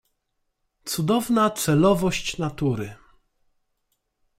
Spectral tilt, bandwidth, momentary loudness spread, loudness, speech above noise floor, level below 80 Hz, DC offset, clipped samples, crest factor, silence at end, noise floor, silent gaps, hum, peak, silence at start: -5.5 dB/octave; 16 kHz; 12 LU; -23 LUFS; 53 dB; -50 dBFS; under 0.1%; under 0.1%; 18 dB; 1.45 s; -75 dBFS; none; none; -8 dBFS; 0.85 s